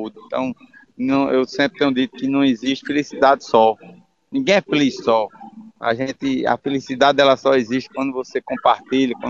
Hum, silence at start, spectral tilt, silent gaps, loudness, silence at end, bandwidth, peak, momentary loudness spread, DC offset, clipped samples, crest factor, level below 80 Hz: none; 0 s; -5 dB/octave; none; -19 LUFS; 0 s; 7.4 kHz; 0 dBFS; 11 LU; under 0.1%; under 0.1%; 18 dB; -58 dBFS